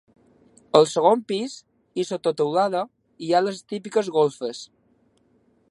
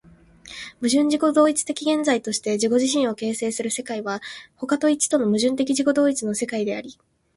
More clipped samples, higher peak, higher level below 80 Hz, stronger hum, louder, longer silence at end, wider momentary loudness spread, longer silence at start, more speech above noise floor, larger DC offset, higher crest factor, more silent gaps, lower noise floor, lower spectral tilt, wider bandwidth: neither; first, 0 dBFS vs -6 dBFS; second, -74 dBFS vs -64 dBFS; neither; about the same, -23 LUFS vs -22 LUFS; first, 1.05 s vs 0.45 s; first, 17 LU vs 13 LU; first, 0.75 s vs 0.45 s; first, 41 dB vs 27 dB; neither; first, 24 dB vs 16 dB; neither; first, -63 dBFS vs -48 dBFS; first, -5 dB/octave vs -3.5 dB/octave; about the same, 11.5 kHz vs 11.5 kHz